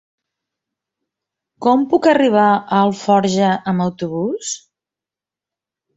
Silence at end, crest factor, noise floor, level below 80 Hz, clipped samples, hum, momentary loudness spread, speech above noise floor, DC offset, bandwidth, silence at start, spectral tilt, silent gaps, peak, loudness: 1.4 s; 16 dB; -88 dBFS; -60 dBFS; under 0.1%; none; 9 LU; 73 dB; under 0.1%; 8 kHz; 1.6 s; -5.5 dB/octave; none; -2 dBFS; -16 LUFS